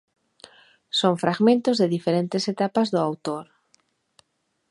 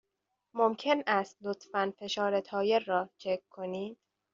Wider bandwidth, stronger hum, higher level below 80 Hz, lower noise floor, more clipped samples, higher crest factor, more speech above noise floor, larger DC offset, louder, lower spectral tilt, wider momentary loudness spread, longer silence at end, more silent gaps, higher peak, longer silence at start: first, 11.5 kHz vs 7.4 kHz; neither; about the same, -74 dBFS vs -78 dBFS; second, -73 dBFS vs -84 dBFS; neither; about the same, 20 dB vs 20 dB; about the same, 51 dB vs 52 dB; neither; first, -23 LUFS vs -32 LUFS; first, -6 dB/octave vs -2.5 dB/octave; about the same, 9 LU vs 11 LU; first, 1.25 s vs 0.4 s; neither; first, -4 dBFS vs -12 dBFS; first, 0.95 s vs 0.55 s